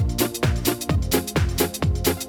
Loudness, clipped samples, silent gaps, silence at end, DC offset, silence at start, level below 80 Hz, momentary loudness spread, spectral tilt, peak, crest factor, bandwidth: -23 LUFS; under 0.1%; none; 0 s; under 0.1%; 0 s; -30 dBFS; 2 LU; -4.5 dB/octave; -10 dBFS; 14 dB; over 20 kHz